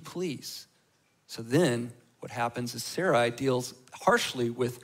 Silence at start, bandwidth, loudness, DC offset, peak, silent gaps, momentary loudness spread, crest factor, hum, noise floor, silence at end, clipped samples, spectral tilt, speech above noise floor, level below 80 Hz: 0 s; 16 kHz; -29 LUFS; under 0.1%; -10 dBFS; none; 16 LU; 20 dB; none; -69 dBFS; 0 s; under 0.1%; -4.5 dB/octave; 40 dB; -70 dBFS